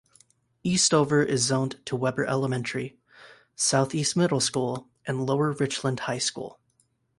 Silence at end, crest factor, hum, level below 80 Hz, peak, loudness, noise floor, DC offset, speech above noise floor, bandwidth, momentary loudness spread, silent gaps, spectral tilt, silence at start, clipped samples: 0.7 s; 18 dB; none; -64 dBFS; -8 dBFS; -25 LUFS; -69 dBFS; under 0.1%; 44 dB; 11.5 kHz; 11 LU; none; -4 dB/octave; 0.65 s; under 0.1%